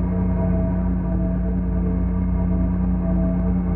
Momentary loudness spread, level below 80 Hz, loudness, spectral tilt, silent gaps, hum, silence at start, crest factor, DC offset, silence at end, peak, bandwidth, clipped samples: 2 LU; -24 dBFS; -22 LUFS; -14 dB/octave; none; none; 0 s; 10 dB; under 0.1%; 0 s; -10 dBFS; 2.8 kHz; under 0.1%